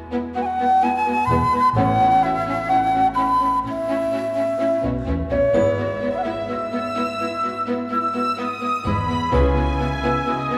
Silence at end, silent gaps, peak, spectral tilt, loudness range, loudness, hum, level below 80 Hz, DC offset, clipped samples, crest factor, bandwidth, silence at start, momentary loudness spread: 0 s; none; -6 dBFS; -7 dB/octave; 4 LU; -20 LUFS; none; -34 dBFS; under 0.1%; under 0.1%; 14 dB; 13 kHz; 0 s; 7 LU